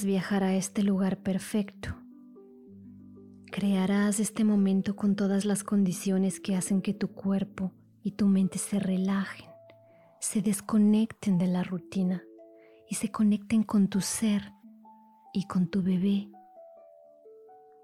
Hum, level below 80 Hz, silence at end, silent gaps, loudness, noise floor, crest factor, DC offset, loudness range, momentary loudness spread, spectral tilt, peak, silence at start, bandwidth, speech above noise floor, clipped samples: none; -64 dBFS; 0.5 s; none; -28 LUFS; -58 dBFS; 12 dB; under 0.1%; 4 LU; 11 LU; -6 dB/octave; -18 dBFS; 0 s; 15 kHz; 30 dB; under 0.1%